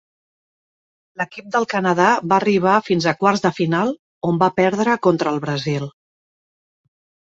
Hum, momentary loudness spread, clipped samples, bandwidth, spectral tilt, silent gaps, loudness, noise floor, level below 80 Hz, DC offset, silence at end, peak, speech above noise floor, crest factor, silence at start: none; 10 LU; under 0.1%; 7.8 kHz; -6 dB/octave; 3.99-4.21 s; -18 LUFS; under -90 dBFS; -60 dBFS; under 0.1%; 1.3 s; -2 dBFS; over 72 dB; 18 dB; 1.2 s